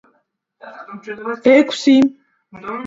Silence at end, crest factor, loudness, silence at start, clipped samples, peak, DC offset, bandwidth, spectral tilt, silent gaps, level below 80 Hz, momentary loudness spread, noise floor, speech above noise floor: 0 s; 18 dB; -14 LUFS; 0.65 s; under 0.1%; 0 dBFS; under 0.1%; 7.8 kHz; -4.5 dB/octave; none; -62 dBFS; 21 LU; -65 dBFS; 50 dB